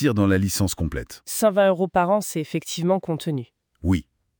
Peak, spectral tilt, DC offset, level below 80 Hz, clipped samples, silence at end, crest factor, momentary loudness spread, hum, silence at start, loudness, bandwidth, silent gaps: -6 dBFS; -5.5 dB/octave; under 0.1%; -44 dBFS; under 0.1%; 0.35 s; 16 dB; 10 LU; none; 0 s; -23 LUFS; over 20 kHz; none